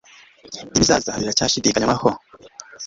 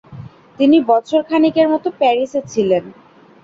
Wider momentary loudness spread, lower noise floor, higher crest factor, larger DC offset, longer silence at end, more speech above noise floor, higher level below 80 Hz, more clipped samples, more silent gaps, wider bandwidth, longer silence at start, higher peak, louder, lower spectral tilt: first, 20 LU vs 6 LU; first, -43 dBFS vs -36 dBFS; first, 20 dB vs 14 dB; neither; second, 0 s vs 0.5 s; about the same, 24 dB vs 22 dB; first, -44 dBFS vs -58 dBFS; neither; neither; about the same, 8 kHz vs 7.6 kHz; first, 0.45 s vs 0.1 s; about the same, 0 dBFS vs -2 dBFS; second, -18 LUFS vs -15 LUFS; second, -3 dB/octave vs -6 dB/octave